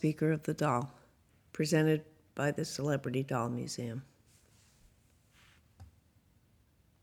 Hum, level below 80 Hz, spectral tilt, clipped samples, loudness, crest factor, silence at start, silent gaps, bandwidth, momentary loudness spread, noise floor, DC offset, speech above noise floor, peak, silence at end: none; -70 dBFS; -6 dB/octave; under 0.1%; -34 LUFS; 20 dB; 0 s; none; 16.5 kHz; 14 LU; -68 dBFS; under 0.1%; 36 dB; -16 dBFS; 1.15 s